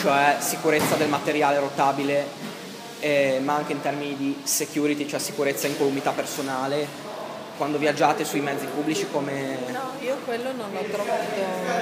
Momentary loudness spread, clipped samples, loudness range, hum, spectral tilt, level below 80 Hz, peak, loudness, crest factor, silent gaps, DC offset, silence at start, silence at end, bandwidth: 9 LU; under 0.1%; 3 LU; none; -3.5 dB/octave; -74 dBFS; -4 dBFS; -25 LUFS; 20 dB; none; under 0.1%; 0 s; 0 s; 15.5 kHz